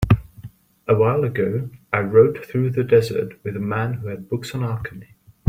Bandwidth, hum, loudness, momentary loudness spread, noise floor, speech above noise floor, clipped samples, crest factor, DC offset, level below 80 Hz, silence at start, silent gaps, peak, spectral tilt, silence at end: 16 kHz; none; -21 LUFS; 12 LU; -42 dBFS; 22 dB; under 0.1%; 18 dB; under 0.1%; -42 dBFS; 0 s; none; -2 dBFS; -8 dB/octave; 0.45 s